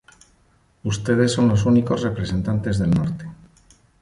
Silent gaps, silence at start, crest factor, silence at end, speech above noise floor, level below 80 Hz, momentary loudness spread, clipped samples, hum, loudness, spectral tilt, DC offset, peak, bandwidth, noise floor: none; 0.85 s; 16 dB; 0.65 s; 40 dB; -42 dBFS; 12 LU; under 0.1%; none; -21 LUFS; -6.5 dB/octave; under 0.1%; -4 dBFS; 11.5 kHz; -59 dBFS